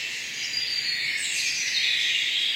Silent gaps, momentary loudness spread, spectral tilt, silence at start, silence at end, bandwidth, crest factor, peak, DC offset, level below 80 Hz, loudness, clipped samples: none; 6 LU; 2.5 dB/octave; 0 s; 0 s; 16 kHz; 14 dB; -12 dBFS; under 0.1%; -72 dBFS; -24 LUFS; under 0.1%